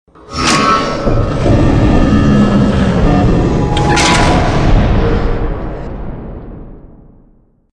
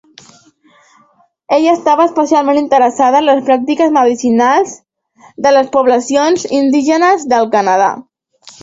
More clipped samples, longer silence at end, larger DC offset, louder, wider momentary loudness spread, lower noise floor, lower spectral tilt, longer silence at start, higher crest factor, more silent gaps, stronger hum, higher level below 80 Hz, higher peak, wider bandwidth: neither; first, 0.85 s vs 0.1 s; neither; about the same, -11 LUFS vs -11 LUFS; first, 16 LU vs 3 LU; second, -48 dBFS vs -52 dBFS; first, -5.5 dB/octave vs -4 dB/octave; second, 0.3 s vs 1.5 s; about the same, 12 dB vs 12 dB; neither; neither; first, -18 dBFS vs -58 dBFS; about the same, 0 dBFS vs 0 dBFS; first, 10.5 kHz vs 8 kHz